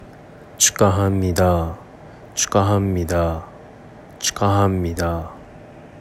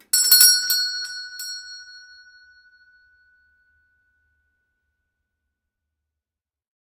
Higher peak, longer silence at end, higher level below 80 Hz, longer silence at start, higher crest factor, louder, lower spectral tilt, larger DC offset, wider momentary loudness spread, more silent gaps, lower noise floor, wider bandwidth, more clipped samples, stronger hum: about the same, 0 dBFS vs 0 dBFS; second, 0 s vs 4.9 s; first, -42 dBFS vs -76 dBFS; second, 0 s vs 0.15 s; second, 20 dB vs 26 dB; second, -19 LUFS vs -14 LUFS; first, -4.5 dB/octave vs 6 dB/octave; neither; second, 14 LU vs 24 LU; neither; second, -41 dBFS vs -89 dBFS; about the same, 15.5 kHz vs 16 kHz; neither; neither